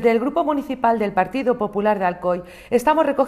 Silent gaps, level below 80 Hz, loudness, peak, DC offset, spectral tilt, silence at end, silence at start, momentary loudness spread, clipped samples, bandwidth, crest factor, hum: none; -52 dBFS; -20 LUFS; -4 dBFS; under 0.1%; -6.5 dB/octave; 0 s; 0 s; 5 LU; under 0.1%; 15 kHz; 16 dB; none